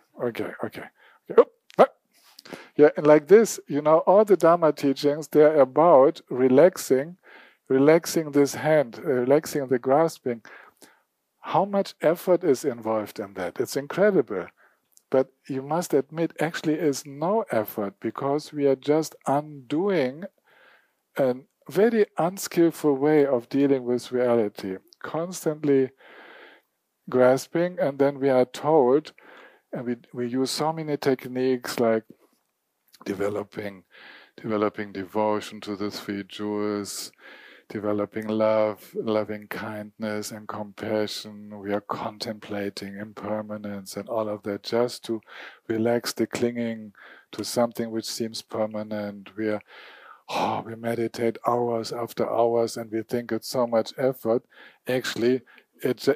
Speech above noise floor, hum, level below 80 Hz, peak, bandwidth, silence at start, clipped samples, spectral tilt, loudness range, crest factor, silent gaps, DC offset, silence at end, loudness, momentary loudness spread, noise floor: 51 dB; none; -76 dBFS; -4 dBFS; 15.5 kHz; 0.15 s; under 0.1%; -5.5 dB/octave; 10 LU; 22 dB; none; under 0.1%; 0 s; -24 LUFS; 15 LU; -75 dBFS